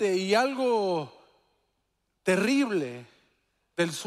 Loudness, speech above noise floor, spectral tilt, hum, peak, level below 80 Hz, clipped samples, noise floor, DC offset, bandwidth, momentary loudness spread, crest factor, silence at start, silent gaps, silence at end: -27 LUFS; 51 dB; -4.5 dB/octave; none; -10 dBFS; -76 dBFS; under 0.1%; -77 dBFS; under 0.1%; 15 kHz; 15 LU; 18 dB; 0 s; none; 0 s